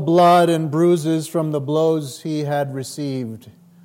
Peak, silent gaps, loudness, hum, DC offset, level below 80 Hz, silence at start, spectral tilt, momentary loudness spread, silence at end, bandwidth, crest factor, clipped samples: -4 dBFS; none; -19 LUFS; none; under 0.1%; -70 dBFS; 0 s; -6.5 dB/octave; 13 LU; 0.35 s; 16.5 kHz; 14 dB; under 0.1%